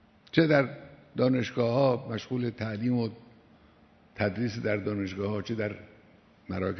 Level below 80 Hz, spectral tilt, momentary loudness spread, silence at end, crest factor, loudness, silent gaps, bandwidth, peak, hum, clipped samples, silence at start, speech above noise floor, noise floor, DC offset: -64 dBFS; -7.5 dB/octave; 11 LU; 0 s; 22 dB; -29 LUFS; none; 6.4 kHz; -8 dBFS; none; under 0.1%; 0.35 s; 31 dB; -59 dBFS; under 0.1%